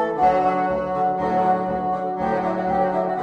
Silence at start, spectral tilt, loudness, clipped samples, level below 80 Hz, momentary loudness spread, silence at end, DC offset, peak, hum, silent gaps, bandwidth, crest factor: 0 s; -8 dB/octave; -21 LUFS; under 0.1%; -48 dBFS; 5 LU; 0 s; under 0.1%; -6 dBFS; none; none; 7.8 kHz; 14 dB